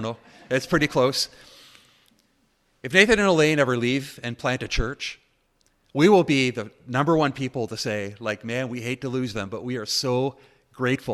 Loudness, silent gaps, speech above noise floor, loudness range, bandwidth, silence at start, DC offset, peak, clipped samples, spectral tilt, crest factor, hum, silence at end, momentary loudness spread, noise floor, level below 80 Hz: -23 LUFS; none; 43 dB; 5 LU; 14.5 kHz; 0 s; under 0.1%; -2 dBFS; under 0.1%; -5 dB/octave; 24 dB; none; 0 s; 13 LU; -66 dBFS; -44 dBFS